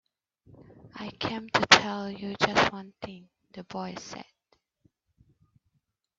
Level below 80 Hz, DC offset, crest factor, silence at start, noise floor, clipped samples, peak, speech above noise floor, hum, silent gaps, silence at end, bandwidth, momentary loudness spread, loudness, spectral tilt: -62 dBFS; under 0.1%; 30 dB; 0.85 s; -77 dBFS; under 0.1%; -2 dBFS; 49 dB; none; none; 1.95 s; 8.2 kHz; 25 LU; -25 LUFS; -2.5 dB/octave